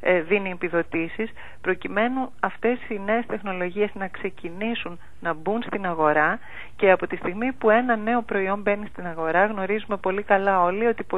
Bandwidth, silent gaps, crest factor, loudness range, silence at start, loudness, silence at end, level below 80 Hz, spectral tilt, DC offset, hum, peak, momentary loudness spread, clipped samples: 7.8 kHz; none; 20 dB; 5 LU; 0.05 s; -24 LUFS; 0 s; -54 dBFS; -7.5 dB/octave; 2%; none; -4 dBFS; 11 LU; under 0.1%